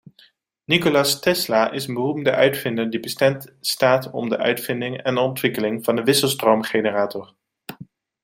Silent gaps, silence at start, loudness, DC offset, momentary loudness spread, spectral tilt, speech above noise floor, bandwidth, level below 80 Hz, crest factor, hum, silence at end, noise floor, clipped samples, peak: none; 0.7 s; -20 LUFS; under 0.1%; 8 LU; -4 dB/octave; 36 dB; 16.5 kHz; -64 dBFS; 20 dB; none; 0.4 s; -56 dBFS; under 0.1%; -2 dBFS